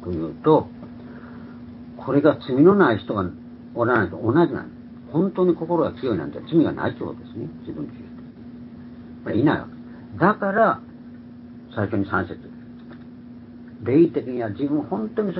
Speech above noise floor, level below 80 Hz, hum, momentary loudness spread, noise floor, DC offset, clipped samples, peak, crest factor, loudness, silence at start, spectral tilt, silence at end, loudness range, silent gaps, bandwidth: 20 dB; -52 dBFS; none; 22 LU; -41 dBFS; under 0.1%; under 0.1%; -2 dBFS; 20 dB; -22 LUFS; 0 s; -12 dB/octave; 0 s; 7 LU; none; 5.6 kHz